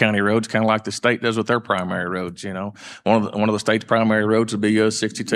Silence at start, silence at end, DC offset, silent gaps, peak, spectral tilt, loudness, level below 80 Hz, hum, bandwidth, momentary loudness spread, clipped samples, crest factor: 0 s; 0 s; under 0.1%; none; -2 dBFS; -5 dB/octave; -20 LUFS; -64 dBFS; none; 12 kHz; 10 LU; under 0.1%; 18 dB